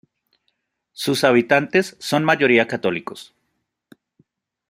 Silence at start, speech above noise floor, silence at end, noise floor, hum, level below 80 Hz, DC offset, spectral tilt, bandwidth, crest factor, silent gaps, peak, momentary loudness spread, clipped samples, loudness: 1 s; 56 dB; 1.45 s; -74 dBFS; none; -66 dBFS; under 0.1%; -5 dB/octave; 16 kHz; 20 dB; none; -2 dBFS; 13 LU; under 0.1%; -18 LUFS